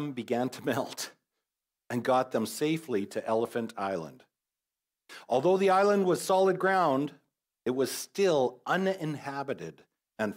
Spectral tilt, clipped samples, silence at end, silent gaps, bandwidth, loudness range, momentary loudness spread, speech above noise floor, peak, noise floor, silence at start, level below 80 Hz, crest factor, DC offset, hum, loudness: -5 dB/octave; under 0.1%; 0 s; none; 16 kHz; 5 LU; 13 LU; over 61 dB; -14 dBFS; under -90 dBFS; 0 s; -82 dBFS; 16 dB; under 0.1%; none; -29 LUFS